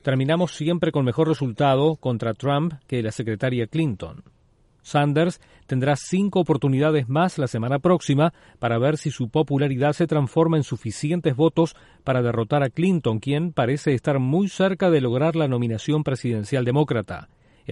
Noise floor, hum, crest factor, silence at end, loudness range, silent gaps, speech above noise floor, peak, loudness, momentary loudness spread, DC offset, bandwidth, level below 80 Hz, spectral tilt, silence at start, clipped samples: -59 dBFS; none; 16 dB; 0 s; 3 LU; none; 38 dB; -6 dBFS; -22 LUFS; 6 LU; under 0.1%; 11.5 kHz; -56 dBFS; -7 dB/octave; 0.05 s; under 0.1%